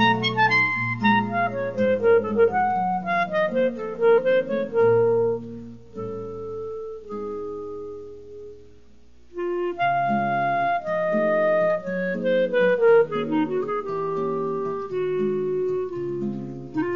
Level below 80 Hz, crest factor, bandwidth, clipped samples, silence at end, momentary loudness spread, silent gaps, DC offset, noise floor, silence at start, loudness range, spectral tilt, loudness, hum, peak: -58 dBFS; 16 dB; 7 kHz; under 0.1%; 0 s; 15 LU; none; 0.5%; -55 dBFS; 0 s; 12 LU; -4 dB/octave; -23 LUFS; none; -8 dBFS